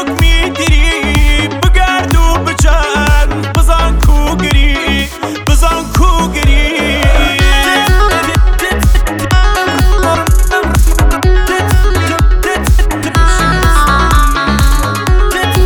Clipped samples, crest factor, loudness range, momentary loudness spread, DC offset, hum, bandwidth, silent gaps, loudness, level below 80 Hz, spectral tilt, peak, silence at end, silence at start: under 0.1%; 8 dB; 1 LU; 3 LU; under 0.1%; none; 19 kHz; none; -11 LUFS; -10 dBFS; -4.5 dB/octave; 0 dBFS; 0 s; 0 s